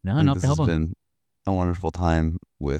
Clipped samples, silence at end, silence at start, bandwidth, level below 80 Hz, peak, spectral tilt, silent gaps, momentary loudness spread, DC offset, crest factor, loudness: under 0.1%; 0 s; 0.05 s; 9.4 kHz; -36 dBFS; -8 dBFS; -7.5 dB/octave; none; 10 LU; under 0.1%; 16 dB; -24 LUFS